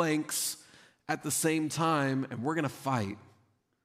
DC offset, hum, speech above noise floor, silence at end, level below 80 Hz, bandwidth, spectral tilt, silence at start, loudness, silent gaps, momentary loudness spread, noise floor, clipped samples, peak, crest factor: under 0.1%; none; 39 dB; 0.65 s; -76 dBFS; 15.5 kHz; -4 dB/octave; 0 s; -31 LUFS; none; 11 LU; -70 dBFS; under 0.1%; -14 dBFS; 18 dB